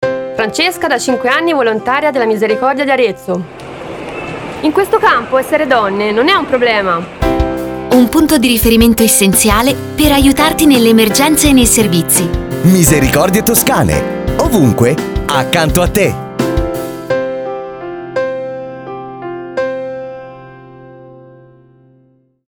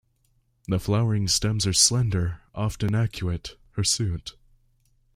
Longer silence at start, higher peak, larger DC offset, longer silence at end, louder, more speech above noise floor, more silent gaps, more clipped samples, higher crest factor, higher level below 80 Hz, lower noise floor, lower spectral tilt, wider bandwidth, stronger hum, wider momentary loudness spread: second, 0 s vs 0.7 s; first, 0 dBFS vs -4 dBFS; neither; first, 1.3 s vs 0.85 s; first, -11 LUFS vs -24 LUFS; about the same, 41 dB vs 43 dB; neither; first, 0.1% vs under 0.1%; second, 12 dB vs 20 dB; first, -28 dBFS vs -46 dBFS; second, -51 dBFS vs -67 dBFS; about the same, -4 dB/octave vs -4 dB/octave; first, over 20 kHz vs 16 kHz; neither; about the same, 15 LU vs 16 LU